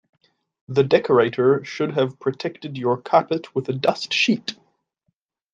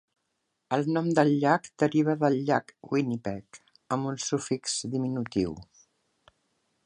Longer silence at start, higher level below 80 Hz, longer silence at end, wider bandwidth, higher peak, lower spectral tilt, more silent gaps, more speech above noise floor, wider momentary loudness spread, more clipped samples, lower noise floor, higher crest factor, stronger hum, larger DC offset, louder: about the same, 0.7 s vs 0.7 s; about the same, -66 dBFS vs -62 dBFS; second, 1 s vs 1.2 s; second, 9.2 kHz vs 11 kHz; first, -4 dBFS vs -8 dBFS; about the same, -5.5 dB/octave vs -5.5 dB/octave; neither; about the same, 53 dB vs 52 dB; about the same, 10 LU vs 10 LU; neither; second, -74 dBFS vs -79 dBFS; about the same, 18 dB vs 22 dB; neither; neither; first, -21 LUFS vs -28 LUFS